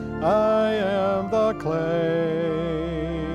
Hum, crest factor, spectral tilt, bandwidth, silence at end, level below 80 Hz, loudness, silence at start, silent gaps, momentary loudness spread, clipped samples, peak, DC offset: none; 12 dB; -7.5 dB/octave; 10 kHz; 0 s; -42 dBFS; -23 LUFS; 0 s; none; 7 LU; under 0.1%; -10 dBFS; under 0.1%